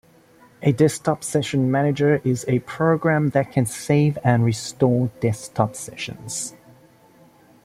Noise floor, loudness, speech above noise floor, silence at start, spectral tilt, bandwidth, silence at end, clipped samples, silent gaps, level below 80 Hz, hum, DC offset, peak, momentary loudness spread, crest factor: -52 dBFS; -21 LUFS; 32 dB; 0.6 s; -6 dB/octave; 15.5 kHz; 1.15 s; under 0.1%; none; -56 dBFS; none; under 0.1%; -2 dBFS; 10 LU; 20 dB